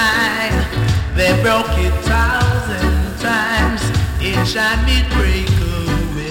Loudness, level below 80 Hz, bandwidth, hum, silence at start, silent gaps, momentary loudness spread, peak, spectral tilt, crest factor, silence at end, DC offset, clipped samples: -16 LUFS; -20 dBFS; 17 kHz; none; 0 s; none; 4 LU; -2 dBFS; -5 dB/octave; 12 dB; 0 s; under 0.1%; under 0.1%